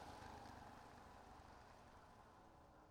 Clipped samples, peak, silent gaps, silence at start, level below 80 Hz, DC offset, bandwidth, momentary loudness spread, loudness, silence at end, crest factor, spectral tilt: under 0.1%; -46 dBFS; none; 0 s; -72 dBFS; under 0.1%; 17 kHz; 9 LU; -62 LUFS; 0 s; 16 dB; -5 dB/octave